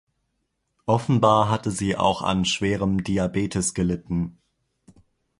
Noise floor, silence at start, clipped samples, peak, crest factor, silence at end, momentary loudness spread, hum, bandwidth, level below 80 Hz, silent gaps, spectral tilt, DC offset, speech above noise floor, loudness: -75 dBFS; 0.85 s; under 0.1%; -4 dBFS; 20 dB; 1.1 s; 9 LU; none; 11.5 kHz; -46 dBFS; none; -5 dB/octave; under 0.1%; 53 dB; -23 LUFS